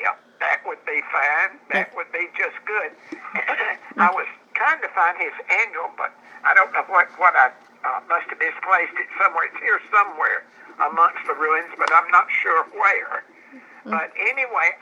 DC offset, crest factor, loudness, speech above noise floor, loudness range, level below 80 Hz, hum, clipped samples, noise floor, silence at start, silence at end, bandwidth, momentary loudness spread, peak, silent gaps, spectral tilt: under 0.1%; 20 dB; -20 LUFS; 26 dB; 4 LU; under -90 dBFS; none; under 0.1%; -46 dBFS; 0 s; 0.05 s; 9.6 kHz; 11 LU; -2 dBFS; none; -3.5 dB/octave